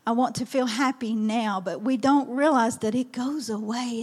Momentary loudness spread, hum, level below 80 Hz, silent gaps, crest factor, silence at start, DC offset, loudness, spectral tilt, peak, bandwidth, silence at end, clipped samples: 8 LU; none; -72 dBFS; none; 16 dB; 0.05 s; under 0.1%; -25 LUFS; -4.5 dB/octave; -10 dBFS; 14 kHz; 0 s; under 0.1%